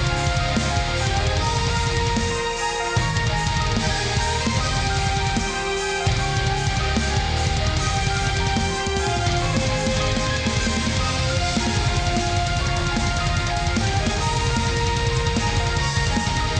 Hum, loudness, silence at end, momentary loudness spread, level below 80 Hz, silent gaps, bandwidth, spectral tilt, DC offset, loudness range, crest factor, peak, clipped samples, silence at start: none; -22 LUFS; 0 s; 1 LU; -28 dBFS; none; 10.5 kHz; -4 dB/octave; under 0.1%; 0 LU; 12 dB; -10 dBFS; under 0.1%; 0 s